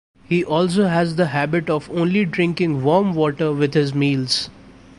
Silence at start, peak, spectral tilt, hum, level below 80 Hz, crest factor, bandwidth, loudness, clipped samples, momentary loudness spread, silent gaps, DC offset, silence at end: 0.3 s; -4 dBFS; -6 dB/octave; none; -52 dBFS; 16 dB; 11.5 kHz; -19 LUFS; under 0.1%; 4 LU; none; under 0.1%; 0.3 s